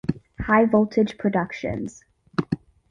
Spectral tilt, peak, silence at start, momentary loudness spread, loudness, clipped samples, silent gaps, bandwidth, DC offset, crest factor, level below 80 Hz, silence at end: -7.5 dB/octave; -6 dBFS; 0.05 s; 14 LU; -23 LUFS; under 0.1%; none; 7.6 kHz; under 0.1%; 18 dB; -46 dBFS; 0.35 s